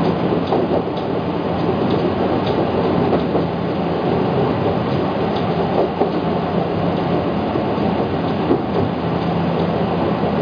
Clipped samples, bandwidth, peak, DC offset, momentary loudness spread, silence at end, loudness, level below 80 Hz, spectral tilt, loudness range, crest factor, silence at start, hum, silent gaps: under 0.1%; 5.2 kHz; -4 dBFS; under 0.1%; 2 LU; 0 s; -19 LUFS; -42 dBFS; -9 dB/octave; 1 LU; 14 dB; 0 s; none; none